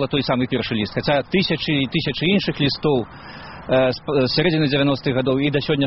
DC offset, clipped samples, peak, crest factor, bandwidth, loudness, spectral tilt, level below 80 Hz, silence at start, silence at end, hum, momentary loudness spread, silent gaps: 0.2%; under 0.1%; -2 dBFS; 16 dB; 6 kHz; -20 LUFS; -4.5 dB/octave; -46 dBFS; 0 s; 0 s; none; 5 LU; none